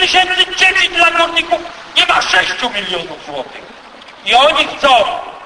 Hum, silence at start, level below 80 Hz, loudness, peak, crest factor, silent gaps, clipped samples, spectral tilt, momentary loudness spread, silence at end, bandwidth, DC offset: none; 0 s; -46 dBFS; -11 LUFS; 0 dBFS; 14 dB; none; under 0.1%; -1 dB/octave; 15 LU; 0 s; 11 kHz; under 0.1%